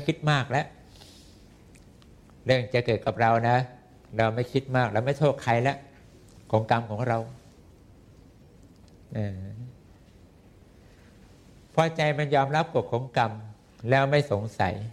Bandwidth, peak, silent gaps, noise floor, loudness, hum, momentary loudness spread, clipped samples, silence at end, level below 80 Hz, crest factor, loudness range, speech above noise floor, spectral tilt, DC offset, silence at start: 12 kHz; -6 dBFS; none; -54 dBFS; -26 LUFS; none; 15 LU; under 0.1%; 0 s; -58 dBFS; 22 dB; 16 LU; 29 dB; -6.5 dB/octave; under 0.1%; 0 s